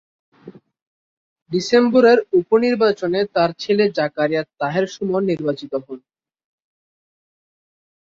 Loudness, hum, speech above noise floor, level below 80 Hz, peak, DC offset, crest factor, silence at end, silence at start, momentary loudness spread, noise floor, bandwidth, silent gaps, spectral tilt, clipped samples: -18 LUFS; none; 26 dB; -62 dBFS; -2 dBFS; under 0.1%; 18 dB; 2.15 s; 0.45 s; 12 LU; -43 dBFS; 7.6 kHz; 0.82-1.36 s, 1.42-1.46 s; -6 dB/octave; under 0.1%